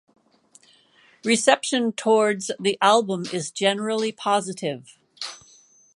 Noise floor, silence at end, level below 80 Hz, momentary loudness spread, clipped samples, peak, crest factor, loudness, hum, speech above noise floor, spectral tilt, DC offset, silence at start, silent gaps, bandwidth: -57 dBFS; 0.6 s; -76 dBFS; 15 LU; under 0.1%; -2 dBFS; 22 dB; -22 LUFS; none; 35 dB; -3 dB/octave; under 0.1%; 1.25 s; none; 11.5 kHz